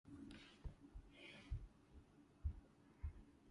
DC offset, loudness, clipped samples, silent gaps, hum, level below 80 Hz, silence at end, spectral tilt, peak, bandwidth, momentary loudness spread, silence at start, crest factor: under 0.1%; -57 LUFS; under 0.1%; none; none; -56 dBFS; 0 s; -6.5 dB/octave; -34 dBFS; 11 kHz; 14 LU; 0.05 s; 20 dB